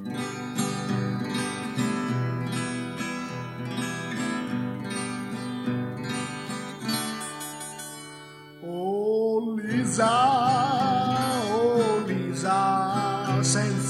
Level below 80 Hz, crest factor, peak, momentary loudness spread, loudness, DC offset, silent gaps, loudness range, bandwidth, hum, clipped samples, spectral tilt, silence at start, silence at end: -64 dBFS; 16 dB; -10 dBFS; 12 LU; -27 LUFS; under 0.1%; none; 8 LU; 15 kHz; none; under 0.1%; -5 dB/octave; 0 s; 0 s